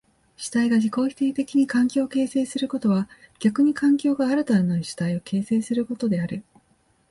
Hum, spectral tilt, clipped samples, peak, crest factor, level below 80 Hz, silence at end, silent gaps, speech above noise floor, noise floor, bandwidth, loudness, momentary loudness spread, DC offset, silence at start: none; -6.5 dB/octave; under 0.1%; -8 dBFS; 14 dB; -62 dBFS; 0.7 s; none; 41 dB; -63 dBFS; 11.5 kHz; -23 LUFS; 7 LU; under 0.1%; 0.4 s